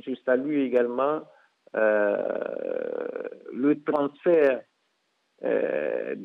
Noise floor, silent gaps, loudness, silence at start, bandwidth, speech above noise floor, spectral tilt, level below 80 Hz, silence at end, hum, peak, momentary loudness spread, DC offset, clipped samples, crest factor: -73 dBFS; none; -26 LUFS; 0.05 s; 4.7 kHz; 48 dB; -8.5 dB/octave; -82 dBFS; 0 s; none; -10 dBFS; 11 LU; under 0.1%; under 0.1%; 16 dB